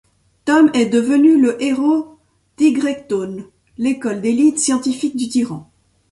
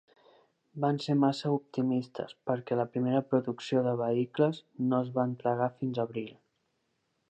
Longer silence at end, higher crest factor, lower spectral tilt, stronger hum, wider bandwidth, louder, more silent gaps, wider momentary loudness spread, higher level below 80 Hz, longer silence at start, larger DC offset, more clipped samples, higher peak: second, 0.5 s vs 0.95 s; about the same, 14 dB vs 18 dB; second, -4 dB/octave vs -8 dB/octave; neither; first, 11.5 kHz vs 8.6 kHz; first, -16 LUFS vs -31 LUFS; neither; first, 13 LU vs 7 LU; first, -58 dBFS vs -78 dBFS; second, 0.45 s vs 0.75 s; neither; neither; first, -2 dBFS vs -12 dBFS